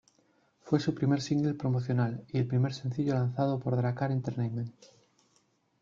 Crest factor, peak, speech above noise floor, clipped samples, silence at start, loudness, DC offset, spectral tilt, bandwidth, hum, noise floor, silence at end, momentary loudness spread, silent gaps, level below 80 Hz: 20 dB; -12 dBFS; 41 dB; under 0.1%; 0.65 s; -31 LUFS; under 0.1%; -8 dB/octave; 7.4 kHz; none; -71 dBFS; 1.1 s; 5 LU; none; -66 dBFS